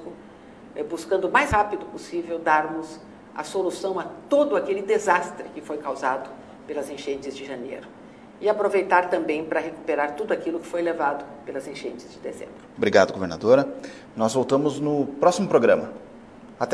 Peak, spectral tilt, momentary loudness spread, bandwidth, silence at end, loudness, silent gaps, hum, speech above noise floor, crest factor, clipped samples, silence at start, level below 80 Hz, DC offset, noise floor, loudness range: -2 dBFS; -5 dB/octave; 17 LU; 11 kHz; 0 s; -24 LUFS; none; none; 21 dB; 22 dB; under 0.1%; 0 s; -54 dBFS; under 0.1%; -45 dBFS; 6 LU